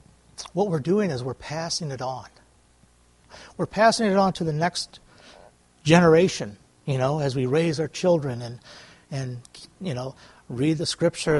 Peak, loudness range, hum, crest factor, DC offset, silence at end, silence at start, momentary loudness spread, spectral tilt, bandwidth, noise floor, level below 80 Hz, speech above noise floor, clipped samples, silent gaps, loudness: -2 dBFS; 7 LU; none; 22 dB; under 0.1%; 0 s; 0.4 s; 18 LU; -5.5 dB/octave; 11.5 kHz; -58 dBFS; -56 dBFS; 35 dB; under 0.1%; none; -24 LUFS